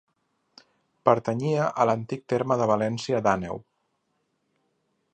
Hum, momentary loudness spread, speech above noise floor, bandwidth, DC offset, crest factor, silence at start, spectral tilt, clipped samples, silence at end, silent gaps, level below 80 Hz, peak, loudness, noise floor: none; 6 LU; 50 dB; 9.2 kHz; under 0.1%; 24 dB; 1.05 s; -6.5 dB/octave; under 0.1%; 1.55 s; none; -62 dBFS; -4 dBFS; -25 LUFS; -75 dBFS